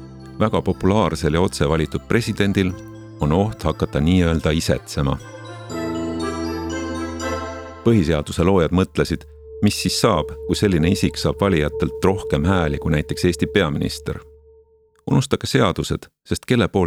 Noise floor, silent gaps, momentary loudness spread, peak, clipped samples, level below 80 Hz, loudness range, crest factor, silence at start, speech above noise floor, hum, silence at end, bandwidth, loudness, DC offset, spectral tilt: -55 dBFS; none; 11 LU; -2 dBFS; under 0.1%; -36 dBFS; 3 LU; 18 dB; 0 s; 36 dB; none; 0 s; 16 kHz; -20 LUFS; under 0.1%; -6 dB/octave